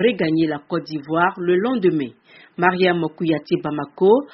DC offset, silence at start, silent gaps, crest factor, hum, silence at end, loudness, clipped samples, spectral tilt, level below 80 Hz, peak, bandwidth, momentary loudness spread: under 0.1%; 0 s; none; 20 dB; none; 0.05 s; -20 LUFS; under 0.1%; -5 dB/octave; -62 dBFS; 0 dBFS; 5.8 kHz; 9 LU